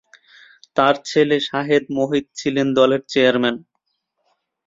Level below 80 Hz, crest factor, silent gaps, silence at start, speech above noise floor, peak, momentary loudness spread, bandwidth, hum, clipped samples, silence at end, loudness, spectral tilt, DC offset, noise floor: -60 dBFS; 18 dB; none; 0.75 s; 55 dB; -2 dBFS; 6 LU; 7.8 kHz; none; under 0.1%; 1.1 s; -18 LUFS; -5 dB/octave; under 0.1%; -73 dBFS